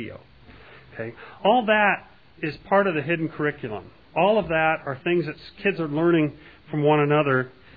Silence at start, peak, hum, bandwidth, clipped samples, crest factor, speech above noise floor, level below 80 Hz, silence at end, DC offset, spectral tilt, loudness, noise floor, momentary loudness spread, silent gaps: 0 s; -6 dBFS; none; 5 kHz; under 0.1%; 18 dB; 25 dB; -56 dBFS; 0.3 s; 0.1%; -9.5 dB/octave; -23 LUFS; -48 dBFS; 16 LU; none